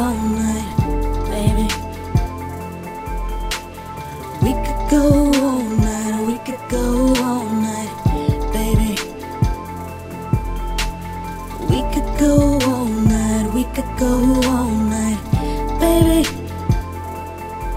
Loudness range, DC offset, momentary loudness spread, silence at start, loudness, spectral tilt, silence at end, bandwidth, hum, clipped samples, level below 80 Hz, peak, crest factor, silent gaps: 6 LU; under 0.1%; 14 LU; 0 s; -19 LUFS; -6 dB/octave; 0 s; 16 kHz; none; under 0.1%; -26 dBFS; 0 dBFS; 18 dB; none